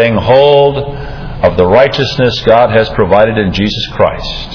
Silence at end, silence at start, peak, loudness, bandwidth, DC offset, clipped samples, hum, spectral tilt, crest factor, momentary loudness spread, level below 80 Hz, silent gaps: 0 s; 0 s; 0 dBFS; -9 LUFS; 5.4 kHz; under 0.1%; 1%; none; -6.5 dB/octave; 10 dB; 11 LU; -28 dBFS; none